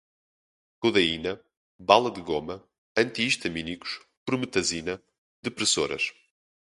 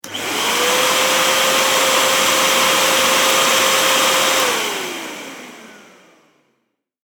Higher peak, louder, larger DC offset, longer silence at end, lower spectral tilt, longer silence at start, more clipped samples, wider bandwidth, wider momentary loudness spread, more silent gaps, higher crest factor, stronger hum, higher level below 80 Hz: about the same, 0 dBFS vs 0 dBFS; second, -26 LUFS vs -14 LUFS; neither; second, 0.55 s vs 1.25 s; first, -3 dB/octave vs 0 dB/octave; first, 0.8 s vs 0.05 s; neither; second, 11.5 kHz vs over 20 kHz; first, 15 LU vs 12 LU; first, 1.57-1.79 s, 2.78-2.95 s, 4.17-4.26 s, 5.18-5.43 s vs none; first, 28 dB vs 18 dB; neither; about the same, -58 dBFS vs -60 dBFS